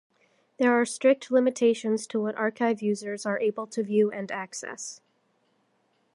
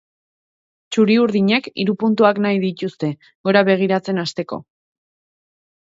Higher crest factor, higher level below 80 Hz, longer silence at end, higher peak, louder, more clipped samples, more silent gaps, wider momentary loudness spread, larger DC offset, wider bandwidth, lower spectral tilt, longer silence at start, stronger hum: about the same, 18 dB vs 18 dB; second, -80 dBFS vs -66 dBFS; about the same, 1.2 s vs 1.2 s; second, -10 dBFS vs 0 dBFS; second, -26 LUFS vs -18 LUFS; neither; second, none vs 3.35-3.44 s; about the same, 12 LU vs 11 LU; neither; first, 11.5 kHz vs 7.8 kHz; second, -4.5 dB/octave vs -6.5 dB/octave; second, 0.6 s vs 0.9 s; neither